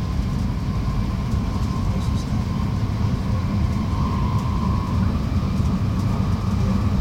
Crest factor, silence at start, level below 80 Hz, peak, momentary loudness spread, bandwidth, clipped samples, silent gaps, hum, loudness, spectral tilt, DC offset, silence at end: 14 dB; 0 s; -28 dBFS; -8 dBFS; 2 LU; 15.5 kHz; under 0.1%; none; none; -23 LUFS; -7.5 dB/octave; under 0.1%; 0 s